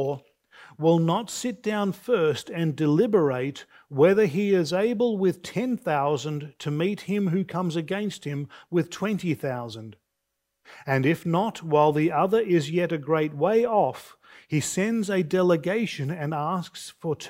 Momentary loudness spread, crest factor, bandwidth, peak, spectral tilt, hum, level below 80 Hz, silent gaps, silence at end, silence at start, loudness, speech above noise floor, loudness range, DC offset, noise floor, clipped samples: 11 LU; 18 dB; 16 kHz; -8 dBFS; -6 dB/octave; none; -68 dBFS; none; 0 s; 0 s; -25 LUFS; 56 dB; 5 LU; under 0.1%; -80 dBFS; under 0.1%